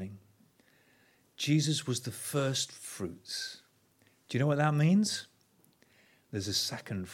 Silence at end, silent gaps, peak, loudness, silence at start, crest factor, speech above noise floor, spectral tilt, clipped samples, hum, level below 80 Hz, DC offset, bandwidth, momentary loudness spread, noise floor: 0 s; none; -12 dBFS; -32 LUFS; 0 s; 20 dB; 37 dB; -4.5 dB/octave; under 0.1%; none; -72 dBFS; under 0.1%; 16.5 kHz; 14 LU; -68 dBFS